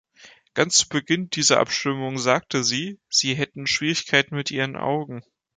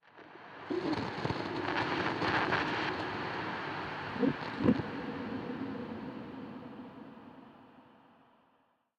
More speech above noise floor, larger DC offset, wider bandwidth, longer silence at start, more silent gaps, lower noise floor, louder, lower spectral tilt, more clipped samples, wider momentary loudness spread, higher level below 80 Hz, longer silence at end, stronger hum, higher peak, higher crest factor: second, 28 dB vs 41 dB; neither; first, 11 kHz vs 9.6 kHz; about the same, 0.25 s vs 0.15 s; neither; second, -51 dBFS vs -72 dBFS; first, -22 LUFS vs -35 LUFS; second, -2.5 dB/octave vs -6.5 dB/octave; neither; second, 8 LU vs 20 LU; about the same, -62 dBFS vs -66 dBFS; second, 0.35 s vs 1.1 s; neither; first, -2 dBFS vs -16 dBFS; about the same, 22 dB vs 22 dB